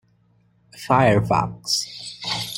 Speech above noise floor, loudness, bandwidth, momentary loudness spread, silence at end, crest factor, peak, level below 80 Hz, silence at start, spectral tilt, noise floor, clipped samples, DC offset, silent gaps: 41 dB; -21 LUFS; 16.5 kHz; 14 LU; 0 s; 20 dB; -4 dBFS; -50 dBFS; 0.75 s; -4.5 dB/octave; -60 dBFS; under 0.1%; under 0.1%; none